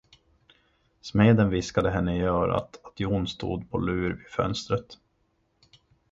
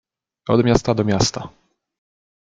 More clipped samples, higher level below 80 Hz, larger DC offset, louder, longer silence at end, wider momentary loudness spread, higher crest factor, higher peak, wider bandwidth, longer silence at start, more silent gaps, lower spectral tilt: neither; about the same, -44 dBFS vs -44 dBFS; neither; second, -26 LUFS vs -18 LUFS; about the same, 1.2 s vs 1.1 s; second, 11 LU vs 17 LU; about the same, 22 dB vs 20 dB; second, -6 dBFS vs -2 dBFS; second, 7.8 kHz vs 9.2 kHz; first, 1.05 s vs 0.45 s; neither; first, -7 dB/octave vs -5.5 dB/octave